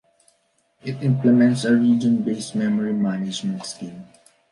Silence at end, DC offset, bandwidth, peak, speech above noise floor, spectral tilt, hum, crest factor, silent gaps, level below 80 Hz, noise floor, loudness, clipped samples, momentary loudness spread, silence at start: 0.5 s; under 0.1%; 11.5 kHz; -6 dBFS; 46 dB; -6.5 dB/octave; none; 14 dB; none; -66 dBFS; -66 dBFS; -20 LUFS; under 0.1%; 16 LU; 0.85 s